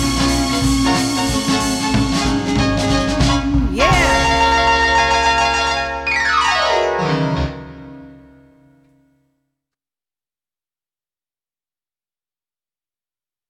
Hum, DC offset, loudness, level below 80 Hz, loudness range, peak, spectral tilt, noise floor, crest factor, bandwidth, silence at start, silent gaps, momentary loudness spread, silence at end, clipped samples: none; under 0.1%; -15 LUFS; -28 dBFS; 9 LU; -2 dBFS; -4 dB/octave; under -90 dBFS; 16 dB; 15.5 kHz; 0 s; none; 5 LU; 5.35 s; under 0.1%